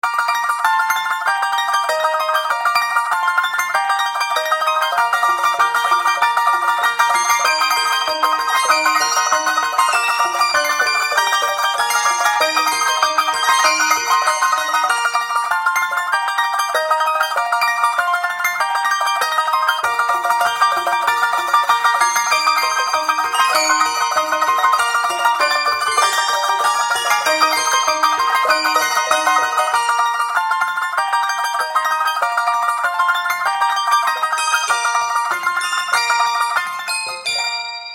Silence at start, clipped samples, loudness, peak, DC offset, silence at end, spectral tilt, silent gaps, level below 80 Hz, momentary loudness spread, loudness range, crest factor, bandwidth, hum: 0.05 s; under 0.1%; -16 LUFS; -2 dBFS; under 0.1%; 0 s; 1.5 dB/octave; none; -68 dBFS; 4 LU; 2 LU; 16 dB; 17 kHz; none